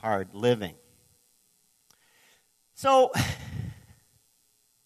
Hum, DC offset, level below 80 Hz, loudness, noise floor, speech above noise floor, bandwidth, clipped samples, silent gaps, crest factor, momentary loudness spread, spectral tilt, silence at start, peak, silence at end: none; under 0.1%; -56 dBFS; -26 LUFS; -68 dBFS; 43 dB; 14 kHz; under 0.1%; none; 20 dB; 17 LU; -5 dB/octave; 0.05 s; -10 dBFS; 1.1 s